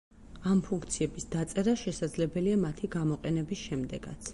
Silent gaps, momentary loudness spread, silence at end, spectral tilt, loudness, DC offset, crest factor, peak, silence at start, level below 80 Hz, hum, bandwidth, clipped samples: none; 7 LU; 0 s; -6 dB/octave; -32 LUFS; under 0.1%; 16 dB; -16 dBFS; 0.15 s; -52 dBFS; none; 11.5 kHz; under 0.1%